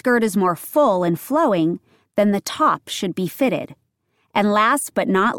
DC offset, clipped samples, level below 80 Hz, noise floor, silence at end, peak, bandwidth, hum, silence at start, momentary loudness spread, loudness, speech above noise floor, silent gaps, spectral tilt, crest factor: under 0.1%; under 0.1%; -64 dBFS; -68 dBFS; 0 s; -4 dBFS; 17.5 kHz; none; 0.05 s; 8 LU; -19 LUFS; 49 dB; none; -5 dB/octave; 16 dB